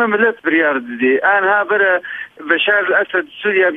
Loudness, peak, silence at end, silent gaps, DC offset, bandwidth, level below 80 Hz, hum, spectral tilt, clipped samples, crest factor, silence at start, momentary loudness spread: -14 LUFS; -2 dBFS; 0 s; none; under 0.1%; 3.9 kHz; -66 dBFS; none; -6 dB/octave; under 0.1%; 14 dB; 0 s; 6 LU